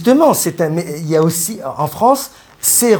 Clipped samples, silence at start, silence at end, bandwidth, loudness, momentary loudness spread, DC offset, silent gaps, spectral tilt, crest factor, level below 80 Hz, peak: under 0.1%; 0 s; 0 s; 19.5 kHz; -15 LUFS; 10 LU; under 0.1%; none; -4.5 dB/octave; 14 dB; -54 dBFS; 0 dBFS